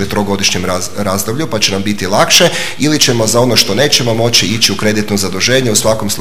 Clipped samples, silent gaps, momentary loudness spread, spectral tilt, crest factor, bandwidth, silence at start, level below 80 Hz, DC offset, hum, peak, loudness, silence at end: 0.2%; none; 8 LU; -3 dB/octave; 12 dB; over 20 kHz; 0 s; -44 dBFS; 7%; none; 0 dBFS; -11 LUFS; 0 s